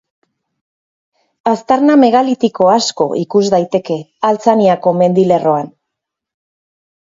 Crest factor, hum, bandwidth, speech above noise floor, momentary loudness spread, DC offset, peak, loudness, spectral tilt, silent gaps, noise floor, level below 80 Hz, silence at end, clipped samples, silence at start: 14 dB; none; 7.8 kHz; 67 dB; 8 LU; under 0.1%; 0 dBFS; -13 LUFS; -6 dB/octave; none; -79 dBFS; -60 dBFS; 1.5 s; under 0.1%; 1.45 s